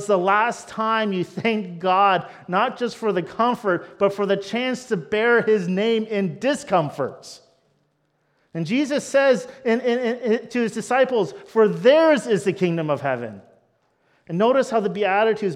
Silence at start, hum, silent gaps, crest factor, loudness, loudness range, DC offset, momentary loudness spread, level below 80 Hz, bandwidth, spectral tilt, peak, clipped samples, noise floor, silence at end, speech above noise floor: 0 s; none; none; 18 dB; -21 LUFS; 4 LU; under 0.1%; 8 LU; -70 dBFS; 12.5 kHz; -5.5 dB/octave; -4 dBFS; under 0.1%; -68 dBFS; 0 s; 47 dB